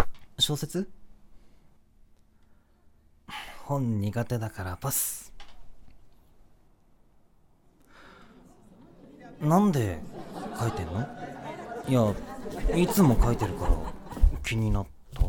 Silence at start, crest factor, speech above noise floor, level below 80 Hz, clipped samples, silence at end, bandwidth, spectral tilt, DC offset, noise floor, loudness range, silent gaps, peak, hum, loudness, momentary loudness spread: 0 s; 24 dB; 34 dB; -36 dBFS; under 0.1%; 0 s; 17.5 kHz; -5.5 dB/octave; under 0.1%; -60 dBFS; 9 LU; none; -6 dBFS; none; -29 LUFS; 17 LU